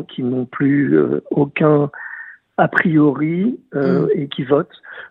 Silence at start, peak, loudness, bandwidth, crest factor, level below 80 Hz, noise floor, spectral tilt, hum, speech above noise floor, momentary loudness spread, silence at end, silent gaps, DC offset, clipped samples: 0 s; 0 dBFS; -17 LUFS; 5.2 kHz; 18 dB; -60 dBFS; -36 dBFS; -10 dB/octave; none; 19 dB; 13 LU; 0.05 s; none; under 0.1%; under 0.1%